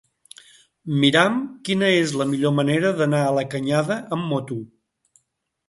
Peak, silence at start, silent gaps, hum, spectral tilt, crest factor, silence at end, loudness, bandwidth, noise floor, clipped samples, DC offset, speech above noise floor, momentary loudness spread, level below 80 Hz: -2 dBFS; 0.85 s; none; none; -5.5 dB/octave; 22 dB; 1 s; -21 LUFS; 11.5 kHz; -75 dBFS; under 0.1%; under 0.1%; 55 dB; 9 LU; -64 dBFS